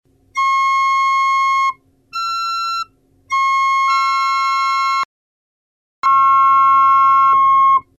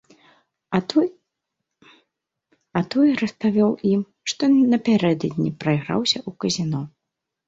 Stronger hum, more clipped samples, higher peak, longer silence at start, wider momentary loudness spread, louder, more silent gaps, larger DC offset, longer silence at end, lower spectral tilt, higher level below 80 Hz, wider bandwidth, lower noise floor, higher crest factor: neither; neither; about the same, -4 dBFS vs -4 dBFS; second, 0.35 s vs 0.7 s; about the same, 11 LU vs 9 LU; first, -14 LUFS vs -21 LUFS; first, 5.05-6.03 s vs none; neither; second, 0.15 s vs 0.6 s; second, 0.5 dB/octave vs -5.5 dB/octave; about the same, -60 dBFS vs -60 dBFS; first, 12.5 kHz vs 7.8 kHz; second, -37 dBFS vs -82 dBFS; second, 10 dB vs 18 dB